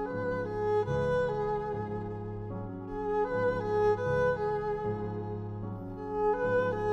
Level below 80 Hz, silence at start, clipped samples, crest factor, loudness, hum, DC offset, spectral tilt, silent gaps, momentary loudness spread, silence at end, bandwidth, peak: -50 dBFS; 0 s; under 0.1%; 14 dB; -32 LUFS; none; under 0.1%; -8 dB/octave; none; 11 LU; 0 s; 8 kHz; -16 dBFS